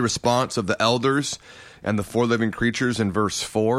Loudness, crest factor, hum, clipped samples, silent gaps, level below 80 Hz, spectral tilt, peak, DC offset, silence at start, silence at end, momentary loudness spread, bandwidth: -23 LUFS; 18 dB; none; under 0.1%; none; -50 dBFS; -4.5 dB/octave; -4 dBFS; under 0.1%; 0 s; 0 s; 6 LU; 15 kHz